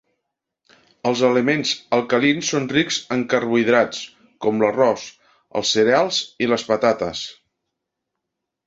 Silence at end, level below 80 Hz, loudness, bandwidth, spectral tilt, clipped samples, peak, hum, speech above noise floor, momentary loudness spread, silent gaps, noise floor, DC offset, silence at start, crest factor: 1.35 s; -60 dBFS; -19 LUFS; 8 kHz; -4 dB/octave; under 0.1%; -2 dBFS; none; 62 dB; 11 LU; none; -81 dBFS; under 0.1%; 1.05 s; 18 dB